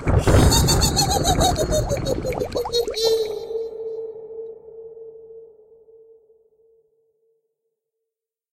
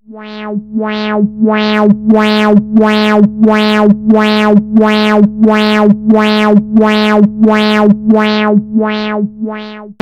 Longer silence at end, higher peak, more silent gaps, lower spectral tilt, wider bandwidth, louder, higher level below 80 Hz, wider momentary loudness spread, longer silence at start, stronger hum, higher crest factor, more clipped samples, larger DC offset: first, 3.05 s vs 0.1 s; second, -4 dBFS vs 0 dBFS; neither; second, -4.5 dB/octave vs -7 dB/octave; first, 16 kHz vs 8.4 kHz; second, -20 LUFS vs -9 LUFS; first, -30 dBFS vs -42 dBFS; first, 24 LU vs 9 LU; about the same, 0 s vs 0.1 s; neither; first, 20 dB vs 8 dB; second, under 0.1% vs 2%; neither